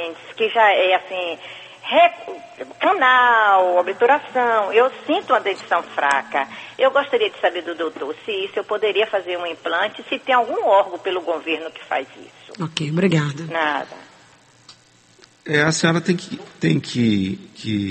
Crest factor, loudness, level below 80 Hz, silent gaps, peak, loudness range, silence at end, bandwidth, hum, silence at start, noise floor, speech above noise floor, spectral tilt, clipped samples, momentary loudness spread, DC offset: 18 dB; -19 LUFS; -66 dBFS; none; -2 dBFS; 7 LU; 0 s; 8.8 kHz; none; 0 s; -52 dBFS; 33 dB; -5 dB/octave; under 0.1%; 13 LU; under 0.1%